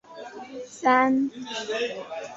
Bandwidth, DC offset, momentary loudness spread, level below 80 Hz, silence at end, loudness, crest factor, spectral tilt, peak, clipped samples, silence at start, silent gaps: 8 kHz; under 0.1%; 19 LU; -72 dBFS; 0 s; -25 LUFS; 20 dB; -3.5 dB/octave; -6 dBFS; under 0.1%; 0.1 s; none